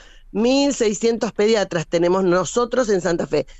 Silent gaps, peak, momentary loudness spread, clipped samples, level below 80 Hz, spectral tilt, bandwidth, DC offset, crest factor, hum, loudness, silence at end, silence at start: none; -8 dBFS; 4 LU; under 0.1%; -44 dBFS; -4.5 dB/octave; 8.4 kHz; under 0.1%; 12 dB; none; -19 LUFS; 0 s; 0.35 s